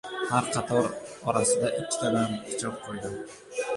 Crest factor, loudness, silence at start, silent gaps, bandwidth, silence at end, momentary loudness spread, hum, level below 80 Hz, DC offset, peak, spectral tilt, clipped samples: 20 dB; -28 LUFS; 0.05 s; none; 11.5 kHz; 0 s; 11 LU; none; -62 dBFS; under 0.1%; -8 dBFS; -4 dB/octave; under 0.1%